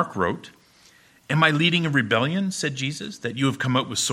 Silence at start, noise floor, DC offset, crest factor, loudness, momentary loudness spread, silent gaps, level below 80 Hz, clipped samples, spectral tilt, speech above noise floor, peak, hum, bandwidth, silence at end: 0 s; -55 dBFS; under 0.1%; 22 dB; -23 LUFS; 10 LU; none; -60 dBFS; under 0.1%; -4 dB/octave; 32 dB; -2 dBFS; none; 16 kHz; 0 s